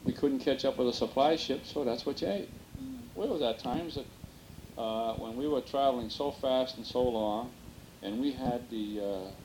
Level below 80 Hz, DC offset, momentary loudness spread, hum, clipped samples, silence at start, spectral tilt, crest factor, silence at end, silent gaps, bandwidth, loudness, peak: -56 dBFS; under 0.1%; 15 LU; none; under 0.1%; 0 s; -5.5 dB/octave; 20 dB; 0 s; none; 19 kHz; -33 LUFS; -14 dBFS